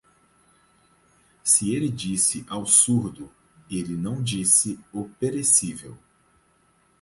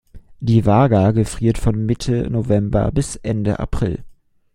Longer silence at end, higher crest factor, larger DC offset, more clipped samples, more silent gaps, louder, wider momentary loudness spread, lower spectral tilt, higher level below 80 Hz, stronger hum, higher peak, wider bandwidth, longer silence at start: first, 1.05 s vs 0.45 s; first, 24 dB vs 16 dB; neither; neither; neither; second, -21 LUFS vs -18 LUFS; first, 17 LU vs 9 LU; second, -3.5 dB/octave vs -7.5 dB/octave; second, -58 dBFS vs -32 dBFS; neither; about the same, -2 dBFS vs -2 dBFS; about the same, 12 kHz vs 12 kHz; first, 1.45 s vs 0.15 s